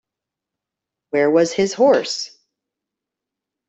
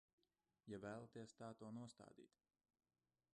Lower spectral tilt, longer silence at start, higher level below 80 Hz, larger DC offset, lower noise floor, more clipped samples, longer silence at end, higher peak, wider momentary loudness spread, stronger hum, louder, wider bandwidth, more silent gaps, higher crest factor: second, -4 dB/octave vs -6 dB/octave; first, 1.15 s vs 0.65 s; first, -66 dBFS vs -88 dBFS; neither; second, -85 dBFS vs under -90 dBFS; neither; first, 1.4 s vs 1.05 s; first, -4 dBFS vs -42 dBFS; about the same, 11 LU vs 9 LU; neither; first, -18 LUFS vs -58 LUFS; second, 8.2 kHz vs 10 kHz; neither; about the same, 18 dB vs 18 dB